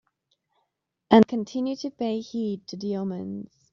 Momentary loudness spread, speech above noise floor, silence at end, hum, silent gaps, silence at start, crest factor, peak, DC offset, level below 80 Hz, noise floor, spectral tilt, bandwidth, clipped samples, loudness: 15 LU; 54 dB; 0.3 s; none; none; 1.1 s; 22 dB; -4 dBFS; under 0.1%; -66 dBFS; -79 dBFS; -5.5 dB/octave; 7.2 kHz; under 0.1%; -25 LUFS